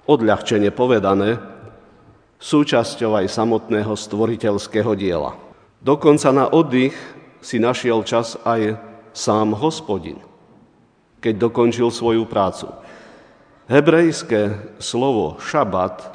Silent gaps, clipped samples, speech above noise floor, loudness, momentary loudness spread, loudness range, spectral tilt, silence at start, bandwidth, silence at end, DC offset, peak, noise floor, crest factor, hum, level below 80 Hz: none; under 0.1%; 38 dB; -18 LUFS; 12 LU; 4 LU; -5.5 dB/octave; 0.1 s; 10 kHz; 0 s; under 0.1%; 0 dBFS; -55 dBFS; 18 dB; none; -54 dBFS